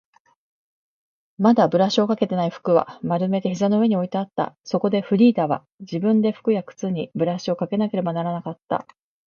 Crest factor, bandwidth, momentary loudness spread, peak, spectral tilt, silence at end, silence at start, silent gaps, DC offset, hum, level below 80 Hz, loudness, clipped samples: 18 dB; 7.2 kHz; 10 LU; -4 dBFS; -7.5 dB/octave; 0.45 s; 1.4 s; 5.74-5.78 s; under 0.1%; none; -68 dBFS; -22 LUFS; under 0.1%